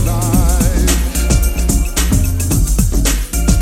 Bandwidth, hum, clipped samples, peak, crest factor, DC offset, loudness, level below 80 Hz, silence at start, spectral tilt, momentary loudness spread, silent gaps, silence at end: 16.5 kHz; none; under 0.1%; 0 dBFS; 12 dB; under 0.1%; -15 LUFS; -14 dBFS; 0 s; -4.5 dB/octave; 2 LU; none; 0 s